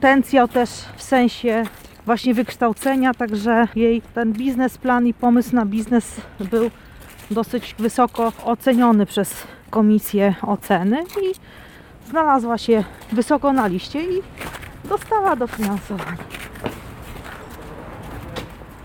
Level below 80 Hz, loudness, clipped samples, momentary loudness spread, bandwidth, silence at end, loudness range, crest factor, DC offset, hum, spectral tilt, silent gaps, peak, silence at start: -46 dBFS; -19 LUFS; under 0.1%; 17 LU; 17.5 kHz; 0 s; 6 LU; 18 dB; under 0.1%; none; -5.5 dB/octave; none; -2 dBFS; 0 s